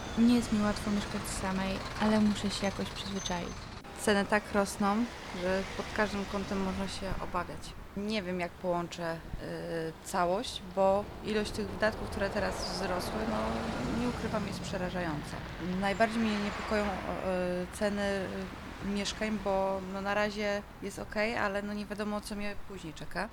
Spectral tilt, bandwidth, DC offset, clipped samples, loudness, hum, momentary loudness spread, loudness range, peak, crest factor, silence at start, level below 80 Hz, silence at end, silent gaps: -5 dB/octave; 19.5 kHz; under 0.1%; under 0.1%; -33 LUFS; none; 10 LU; 3 LU; -12 dBFS; 20 dB; 0 s; -48 dBFS; 0 s; none